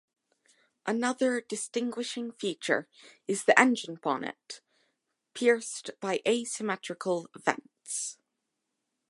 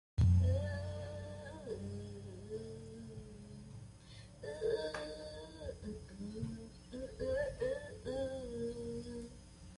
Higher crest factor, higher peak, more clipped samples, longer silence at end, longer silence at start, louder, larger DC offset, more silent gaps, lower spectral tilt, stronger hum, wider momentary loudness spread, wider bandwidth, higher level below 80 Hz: first, 28 dB vs 18 dB; first, -2 dBFS vs -22 dBFS; neither; first, 0.95 s vs 0 s; first, 0.85 s vs 0.15 s; first, -30 LUFS vs -41 LUFS; neither; neither; second, -3 dB/octave vs -7 dB/octave; neither; about the same, 14 LU vs 16 LU; about the same, 11.5 kHz vs 11.5 kHz; second, -86 dBFS vs -48 dBFS